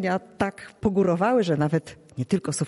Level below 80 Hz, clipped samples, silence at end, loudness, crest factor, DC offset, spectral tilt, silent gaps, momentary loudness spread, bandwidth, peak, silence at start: -54 dBFS; under 0.1%; 0 s; -25 LUFS; 16 dB; under 0.1%; -6.5 dB/octave; none; 7 LU; 11.5 kHz; -10 dBFS; 0 s